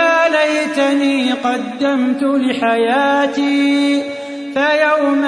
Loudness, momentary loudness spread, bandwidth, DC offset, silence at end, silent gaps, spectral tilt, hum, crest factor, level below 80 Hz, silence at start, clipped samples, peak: -15 LUFS; 6 LU; 10.5 kHz; under 0.1%; 0 s; none; -3.5 dB/octave; none; 12 dB; -66 dBFS; 0 s; under 0.1%; -2 dBFS